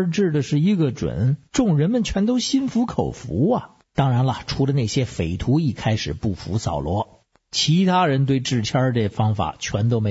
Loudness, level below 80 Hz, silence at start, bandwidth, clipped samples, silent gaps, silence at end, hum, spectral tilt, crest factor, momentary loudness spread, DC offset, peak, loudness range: -21 LUFS; -42 dBFS; 0 s; 8 kHz; under 0.1%; none; 0 s; none; -6 dB/octave; 14 dB; 7 LU; under 0.1%; -6 dBFS; 2 LU